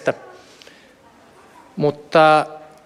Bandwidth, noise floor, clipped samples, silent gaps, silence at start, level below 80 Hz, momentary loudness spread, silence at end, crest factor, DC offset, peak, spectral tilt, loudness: 11.5 kHz; -49 dBFS; under 0.1%; none; 0.05 s; -68 dBFS; 20 LU; 0.25 s; 20 dB; under 0.1%; -2 dBFS; -6 dB/octave; -17 LUFS